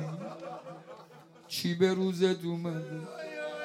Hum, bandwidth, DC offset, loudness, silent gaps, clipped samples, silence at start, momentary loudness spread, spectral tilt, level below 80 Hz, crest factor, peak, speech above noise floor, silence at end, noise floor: none; 16 kHz; under 0.1%; -32 LUFS; none; under 0.1%; 0 s; 19 LU; -6 dB/octave; -80 dBFS; 20 dB; -12 dBFS; 24 dB; 0 s; -54 dBFS